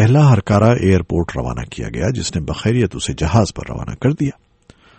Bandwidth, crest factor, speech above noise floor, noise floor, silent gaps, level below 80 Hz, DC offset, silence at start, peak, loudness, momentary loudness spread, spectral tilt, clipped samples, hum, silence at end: 8.8 kHz; 16 dB; 33 dB; -49 dBFS; none; -34 dBFS; under 0.1%; 0 s; 0 dBFS; -17 LUFS; 12 LU; -6.5 dB/octave; under 0.1%; none; 0.65 s